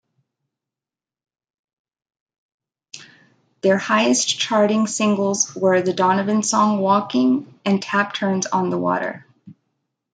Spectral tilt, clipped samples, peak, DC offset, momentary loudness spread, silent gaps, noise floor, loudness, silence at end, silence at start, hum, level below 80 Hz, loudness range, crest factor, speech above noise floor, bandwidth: -4 dB/octave; under 0.1%; -4 dBFS; under 0.1%; 6 LU; none; under -90 dBFS; -19 LUFS; 0.65 s; 2.95 s; none; -70 dBFS; 5 LU; 18 dB; over 71 dB; 9.6 kHz